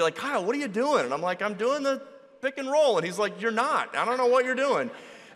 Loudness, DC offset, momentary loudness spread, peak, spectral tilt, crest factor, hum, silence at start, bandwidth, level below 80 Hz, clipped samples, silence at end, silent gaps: -26 LUFS; under 0.1%; 9 LU; -10 dBFS; -4 dB/octave; 16 dB; none; 0 s; 13 kHz; -76 dBFS; under 0.1%; 0.1 s; none